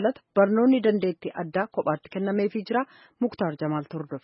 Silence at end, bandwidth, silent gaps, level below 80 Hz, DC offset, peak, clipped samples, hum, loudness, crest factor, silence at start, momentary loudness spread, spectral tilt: 0.05 s; 5.8 kHz; none; -70 dBFS; under 0.1%; -8 dBFS; under 0.1%; none; -26 LUFS; 18 dB; 0 s; 10 LU; -11.5 dB/octave